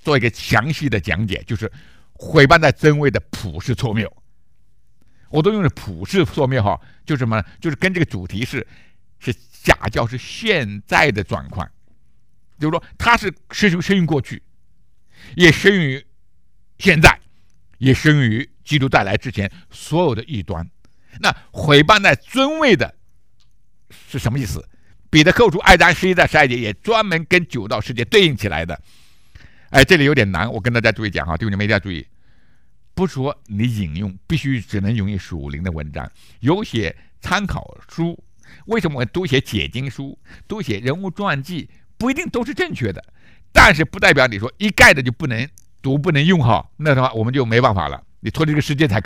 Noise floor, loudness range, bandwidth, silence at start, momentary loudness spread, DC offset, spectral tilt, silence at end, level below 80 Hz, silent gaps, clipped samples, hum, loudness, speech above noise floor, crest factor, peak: -61 dBFS; 9 LU; 16 kHz; 0.05 s; 17 LU; 0.6%; -5.5 dB/octave; 0 s; -36 dBFS; none; 0.2%; none; -17 LUFS; 44 dB; 18 dB; 0 dBFS